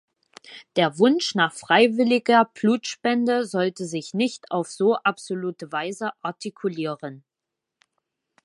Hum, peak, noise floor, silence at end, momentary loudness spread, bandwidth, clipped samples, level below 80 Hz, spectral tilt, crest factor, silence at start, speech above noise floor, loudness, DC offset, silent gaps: none; -2 dBFS; -85 dBFS; 1.25 s; 12 LU; 11.5 kHz; under 0.1%; -76 dBFS; -4.5 dB/octave; 22 dB; 0.5 s; 63 dB; -23 LUFS; under 0.1%; none